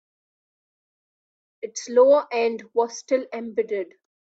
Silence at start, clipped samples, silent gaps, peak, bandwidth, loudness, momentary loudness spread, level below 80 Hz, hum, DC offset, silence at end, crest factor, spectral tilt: 1.65 s; under 0.1%; none; -6 dBFS; 8 kHz; -22 LUFS; 17 LU; -76 dBFS; none; under 0.1%; 0.4 s; 20 dB; -3 dB/octave